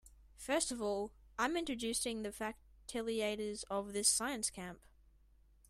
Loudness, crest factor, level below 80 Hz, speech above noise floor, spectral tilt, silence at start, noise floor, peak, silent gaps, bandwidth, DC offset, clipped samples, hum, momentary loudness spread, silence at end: -37 LUFS; 24 dB; -64 dBFS; 28 dB; -2 dB/octave; 0.05 s; -67 dBFS; -16 dBFS; none; 15.5 kHz; under 0.1%; under 0.1%; none; 13 LU; 0.9 s